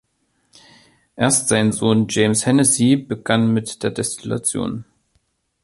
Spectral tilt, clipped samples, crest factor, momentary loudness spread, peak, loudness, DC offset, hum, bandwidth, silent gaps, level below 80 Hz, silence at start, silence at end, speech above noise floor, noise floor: -4.5 dB/octave; under 0.1%; 18 dB; 10 LU; -2 dBFS; -18 LUFS; under 0.1%; none; 12 kHz; none; -54 dBFS; 1.15 s; 0.8 s; 49 dB; -67 dBFS